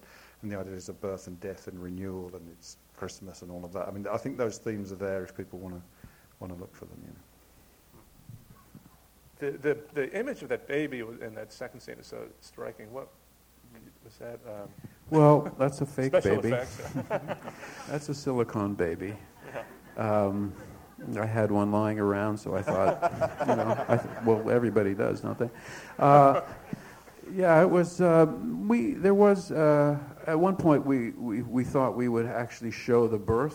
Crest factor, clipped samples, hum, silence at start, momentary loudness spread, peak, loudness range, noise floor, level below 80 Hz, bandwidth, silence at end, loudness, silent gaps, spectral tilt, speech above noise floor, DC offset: 24 dB; under 0.1%; none; 0.4 s; 22 LU; -4 dBFS; 17 LU; -59 dBFS; -60 dBFS; 19.5 kHz; 0 s; -27 LUFS; none; -7.5 dB/octave; 31 dB; under 0.1%